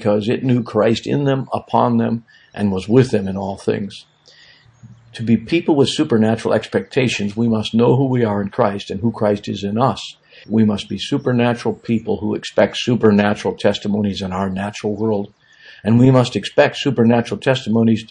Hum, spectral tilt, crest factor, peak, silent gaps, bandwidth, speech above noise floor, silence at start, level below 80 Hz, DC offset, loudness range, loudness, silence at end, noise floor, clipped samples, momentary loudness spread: none; -6.5 dB/octave; 18 dB; 0 dBFS; none; 10 kHz; 31 dB; 0 s; -54 dBFS; under 0.1%; 3 LU; -17 LUFS; 0.05 s; -48 dBFS; under 0.1%; 8 LU